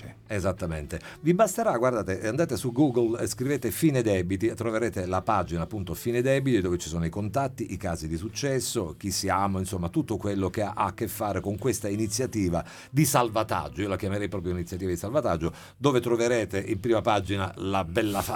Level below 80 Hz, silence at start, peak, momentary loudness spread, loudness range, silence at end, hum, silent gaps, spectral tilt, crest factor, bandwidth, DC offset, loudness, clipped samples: -50 dBFS; 0 s; -8 dBFS; 8 LU; 3 LU; 0 s; none; none; -5.5 dB/octave; 20 dB; 19 kHz; under 0.1%; -27 LUFS; under 0.1%